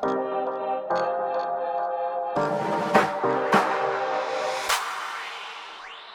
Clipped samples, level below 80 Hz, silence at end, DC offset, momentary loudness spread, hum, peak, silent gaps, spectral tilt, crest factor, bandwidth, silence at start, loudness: under 0.1%; -66 dBFS; 0 s; under 0.1%; 12 LU; none; -6 dBFS; none; -4 dB/octave; 20 dB; over 20 kHz; 0 s; -26 LUFS